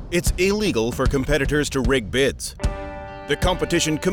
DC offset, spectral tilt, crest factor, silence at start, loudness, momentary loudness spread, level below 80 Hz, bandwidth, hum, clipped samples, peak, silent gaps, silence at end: under 0.1%; -4.5 dB/octave; 12 dB; 0 s; -21 LUFS; 8 LU; -30 dBFS; 20 kHz; none; under 0.1%; -10 dBFS; none; 0 s